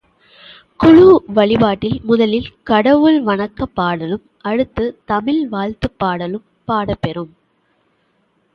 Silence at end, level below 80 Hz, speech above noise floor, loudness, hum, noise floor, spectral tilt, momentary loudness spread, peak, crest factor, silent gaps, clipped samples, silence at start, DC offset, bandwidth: 1.3 s; -42 dBFS; 47 dB; -15 LUFS; none; -61 dBFS; -8.5 dB/octave; 14 LU; 0 dBFS; 16 dB; none; under 0.1%; 0.8 s; under 0.1%; 6 kHz